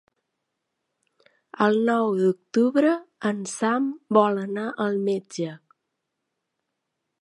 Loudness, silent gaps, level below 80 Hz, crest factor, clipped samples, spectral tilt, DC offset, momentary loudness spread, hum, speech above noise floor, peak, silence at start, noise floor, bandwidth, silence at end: -24 LUFS; none; -78 dBFS; 22 dB; under 0.1%; -6 dB/octave; under 0.1%; 8 LU; none; 58 dB; -4 dBFS; 1.55 s; -81 dBFS; 11.5 kHz; 1.65 s